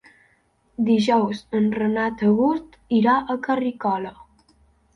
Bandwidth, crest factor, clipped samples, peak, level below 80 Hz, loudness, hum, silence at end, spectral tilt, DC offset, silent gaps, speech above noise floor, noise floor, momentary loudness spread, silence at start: 7.8 kHz; 16 dB; under 0.1%; -6 dBFS; -58 dBFS; -21 LUFS; none; 0.85 s; -7 dB/octave; under 0.1%; none; 42 dB; -63 dBFS; 9 LU; 0.8 s